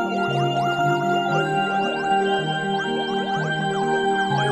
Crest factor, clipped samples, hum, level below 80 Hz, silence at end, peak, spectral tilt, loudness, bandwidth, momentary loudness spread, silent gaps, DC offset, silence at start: 12 dB; under 0.1%; none; -62 dBFS; 0 s; -10 dBFS; -5.5 dB/octave; -22 LUFS; 13.5 kHz; 3 LU; none; under 0.1%; 0 s